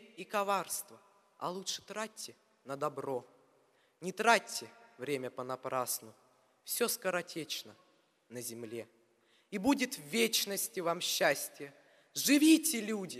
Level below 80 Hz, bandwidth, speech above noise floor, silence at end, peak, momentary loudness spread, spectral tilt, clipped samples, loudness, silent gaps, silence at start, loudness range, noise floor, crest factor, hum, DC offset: -78 dBFS; 15.5 kHz; 36 dB; 0 s; -10 dBFS; 17 LU; -2.5 dB/octave; under 0.1%; -34 LUFS; none; 0 s; 9 LU; -70 dBFS; 24 dB; none; under 0.1%